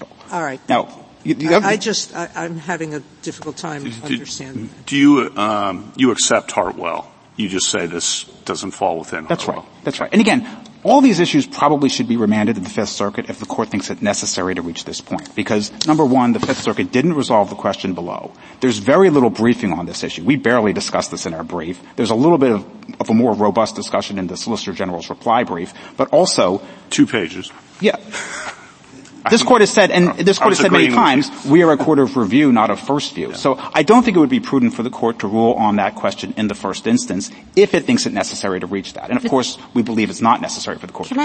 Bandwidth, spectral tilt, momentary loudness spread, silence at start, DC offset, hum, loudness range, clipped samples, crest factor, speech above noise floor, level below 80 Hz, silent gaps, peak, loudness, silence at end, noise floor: 8.8 kHz; -4.5 dB/octave; 14 LU; 0 s; under 0.1%; none; 6 LU; under 0.1%; 16 dB; 24 dB; -56 dBFS; none; 0 dBFS; -17 LUFS; 0 s; -41 dBFS